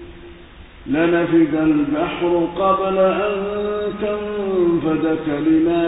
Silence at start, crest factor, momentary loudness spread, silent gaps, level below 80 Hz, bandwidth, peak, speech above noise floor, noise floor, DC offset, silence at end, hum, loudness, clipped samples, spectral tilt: 0 s; 14 dB; 7 LU; none; -44 dBFS; 4 kHz; -4 dBFS; 23 dB; -40 dBFS; under 0.1%; 0 s; none; -18 LUFS; under 0.1%; -12 dB/octave